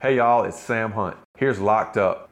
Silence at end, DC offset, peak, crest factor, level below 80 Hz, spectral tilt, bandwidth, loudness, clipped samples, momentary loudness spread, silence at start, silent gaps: 0.05 s; under 0.1%; -8 dBFS; 14 dB; -62 dBFS; -6.5 dB/octave; 12.5 kHz; -22 LUFS; under 0.1%; 8 LU; 0 s; 1.25-1.34 s